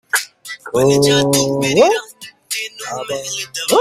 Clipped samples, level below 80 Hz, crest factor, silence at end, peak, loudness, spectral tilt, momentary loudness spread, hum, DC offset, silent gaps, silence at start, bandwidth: under 0.1%; -52 dBFS; 16 dB; 0 s; 0 dBFS; -16 LUFS; -3.5 dB/octave; 15 LU; none; under 0.1%; none; 0.15 s; 16 kHz